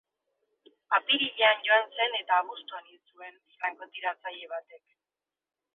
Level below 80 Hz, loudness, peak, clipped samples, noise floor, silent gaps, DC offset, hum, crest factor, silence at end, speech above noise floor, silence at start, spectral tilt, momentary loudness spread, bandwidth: -90 dBFS; -27 LUFS; -10 dBFS; under 0.1%; under -90 dBFS; none; under 0.1%; none; 22 dB; 1 s; over 60 dB; 0.9 s; -4 dB/octave; 22 LU; 4.2 kHz